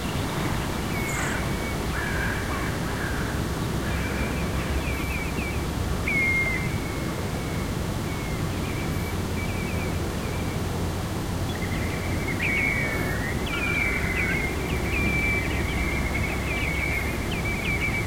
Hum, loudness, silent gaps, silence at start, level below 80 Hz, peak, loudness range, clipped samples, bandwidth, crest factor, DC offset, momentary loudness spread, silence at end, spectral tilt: none; -26 LUFS; none; 0 s; -34 dBFS; -12 dBFS; 4 LU; under 0.1%; 16.5 kHz; 14 dB; 0.3%; 6 LU; 0 s; -5 dB/octave